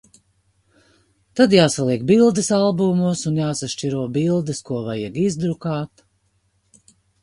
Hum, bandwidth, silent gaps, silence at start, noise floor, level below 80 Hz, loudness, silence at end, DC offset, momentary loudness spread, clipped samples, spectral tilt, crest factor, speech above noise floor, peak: 50 Hz at -45 dBFS; 11.5 kHz; none; 1.35 s; -65 dBFS; -56 dBFS; -19 LUFS; 1.35 s; under 0.1%; 11 LU; under 0.1%; -5.5 dB/octave; 20 dB; 47 dB; 0 dBFS